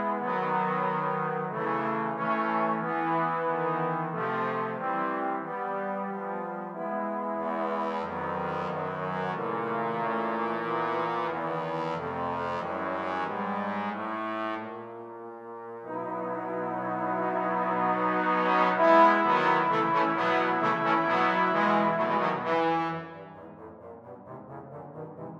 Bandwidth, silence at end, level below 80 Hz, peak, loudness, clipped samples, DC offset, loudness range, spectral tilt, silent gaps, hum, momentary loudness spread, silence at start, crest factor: 8.4 kHz; 0 s; -72 dBFS; -8 dBFS; -28 LUFS; under 0.1%; under 0.1%; 9 LU; -7 dB/octave; none; none; 17 LU; 0 s; 20 dB